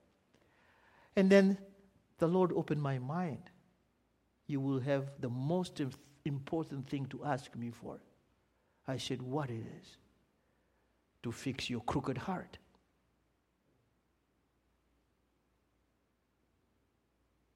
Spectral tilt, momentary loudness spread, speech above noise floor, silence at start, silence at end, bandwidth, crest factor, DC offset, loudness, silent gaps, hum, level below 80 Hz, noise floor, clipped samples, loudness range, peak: -7 dB/octave; 16 LU; 43 dB; 1.15 s; 5 s; 12 kHz; 26 dB; under 0.1%; -36 LUFS; none; none; -70 dBFS; -78 dBFS; under 0.1%; 11 LU; -12 dBFS